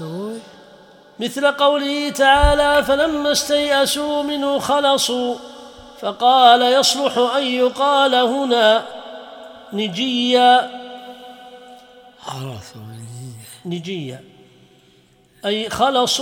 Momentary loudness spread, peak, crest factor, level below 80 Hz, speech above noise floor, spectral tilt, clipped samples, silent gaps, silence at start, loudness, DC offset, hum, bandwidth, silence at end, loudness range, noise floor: 22 LU; 0 dBFS; 18 dB; -36 dBFS; 37 dB; -3 dB/octave; under 0.1%; none; 0 s; -16 LUFS; under 0.1%; none; 18 kHz; 0 s; 17 LU; -54 dBFS